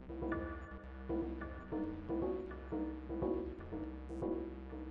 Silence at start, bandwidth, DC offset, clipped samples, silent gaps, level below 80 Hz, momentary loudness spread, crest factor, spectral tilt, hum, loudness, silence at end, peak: 0 s; 4.9 kHz; under 0.1%; under 0.1%; none; -52 dBFS; 7 LU; 16 dB; -8 dB/octave; none; -43 LUFS; 0 s; -26 dBFS